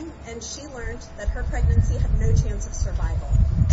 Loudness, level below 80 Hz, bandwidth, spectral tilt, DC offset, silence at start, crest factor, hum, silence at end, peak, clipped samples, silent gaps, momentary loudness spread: -25 LUFS; -24 dBFS; 7.8 kHz; -6 dB/octave; under 0.1%; 0 s; 16 dB; none; 0 s; -6 dBFS; under 0.1%; none; 13 LU